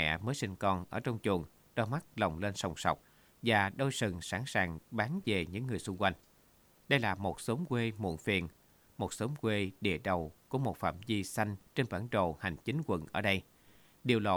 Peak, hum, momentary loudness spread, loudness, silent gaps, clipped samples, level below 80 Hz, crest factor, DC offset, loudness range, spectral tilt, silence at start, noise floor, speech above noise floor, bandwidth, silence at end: -14 dBFS; none; 6 LU; -35 LUFS; none; under 0.1%; -60 dBFS; 22 dB; under 0.1%; 2 LU; -5.5 dB/octave; 0 s; -66 dBFS; 31 dB; over 20 kHz; 0 s